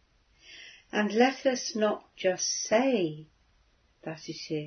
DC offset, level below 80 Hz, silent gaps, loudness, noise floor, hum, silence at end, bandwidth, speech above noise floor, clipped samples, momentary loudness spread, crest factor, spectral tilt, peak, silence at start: under 0.1%; -70 dBFS; none; -28 LUFS; -66 dBFS; none; 0 s; 6.6 kHz; 38 dB; under 0.1%; 21 LU; 22 dB; -3.5 dB/octave; -10 dBFS; 0.5 s